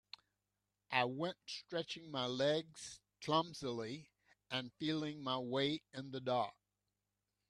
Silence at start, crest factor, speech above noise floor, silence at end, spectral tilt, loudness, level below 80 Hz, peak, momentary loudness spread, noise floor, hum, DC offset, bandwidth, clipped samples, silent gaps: 0.9 s; 24 dB; 49 dB; 1 s; -4.5 dB/octave; -40 LUFS; -80 dBFS; -18 dBFS; 13 LU; -89 dBFS; 50 Hz at -80 dBFS; under 0.1%; 12 kHz; under 0.1%; none